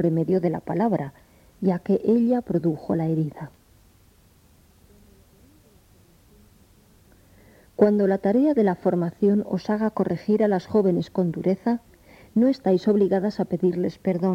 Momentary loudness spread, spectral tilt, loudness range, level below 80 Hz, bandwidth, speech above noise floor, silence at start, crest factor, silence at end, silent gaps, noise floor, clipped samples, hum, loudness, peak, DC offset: 7 LU; -9.5 dB/octave; 7 LU; -58 dBFS; 8.8 kHz; 34 dB; 0 s; 18 dB; 0 s; none; -56 dBFS; under 0.1%; none; -23 LUFS; -6 dBFS; under 0.1%